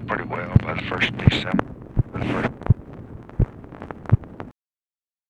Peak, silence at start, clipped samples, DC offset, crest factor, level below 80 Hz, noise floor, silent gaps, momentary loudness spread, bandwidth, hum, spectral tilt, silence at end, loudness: 0 dBFS; 0 s; under 0.1%; under 0.1%; 24 dB; -34 dBFS; under -90 dBFS; none; 20 LU; 8.2 kHz; none; -7.5 dB/octave; 0.8 s; -23 LUFS